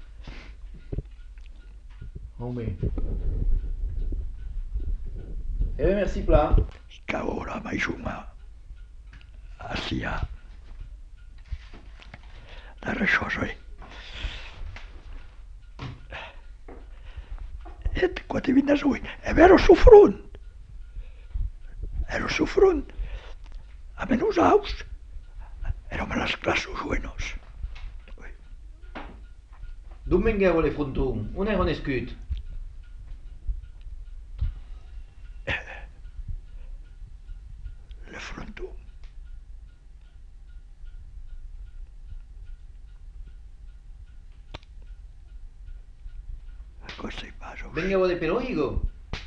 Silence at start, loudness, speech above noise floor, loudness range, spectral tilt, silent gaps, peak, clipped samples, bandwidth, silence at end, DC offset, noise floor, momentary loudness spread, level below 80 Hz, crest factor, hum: 0 s; -25 LUFS; 25 dB; 25 LU; -6.5 dB/octave; none; 0 dBFS; under 0.1%; 7.8 kHz; 0 s; under 0.1%; -47 dBFS; 26 LU; -34 dBFS; 26 dB; none